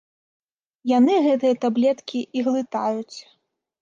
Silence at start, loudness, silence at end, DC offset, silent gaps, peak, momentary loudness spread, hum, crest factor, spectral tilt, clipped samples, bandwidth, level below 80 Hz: 0.85 s; -21 LUFS; 0.6 s; under 0.1%; none; -8 dBFS; 13 LU; none; 14 dB; -5.5 dB/octave; under 0.1%; 7.4 kHz; -76 dBFS